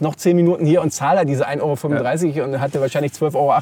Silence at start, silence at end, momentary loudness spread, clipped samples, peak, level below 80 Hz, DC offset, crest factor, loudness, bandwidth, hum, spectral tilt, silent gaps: 0 s; 0 s; 5 LU; under 0.1%; -4 dBFS; -62 dBFS; under 0.1%; 12 dB; -18 LUFS; 17.5 kHz; none; -6.5 dB/octave; none